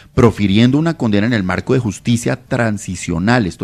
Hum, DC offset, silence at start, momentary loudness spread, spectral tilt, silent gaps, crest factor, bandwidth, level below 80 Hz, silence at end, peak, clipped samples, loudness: none; under 0.1%; 0.15 s; 7 LU; -6 dB/octave; none; 14 dB; 13 kHz; -42 dBFS; 0 s; 0 dBFS; under 0.1%; -15 LUFS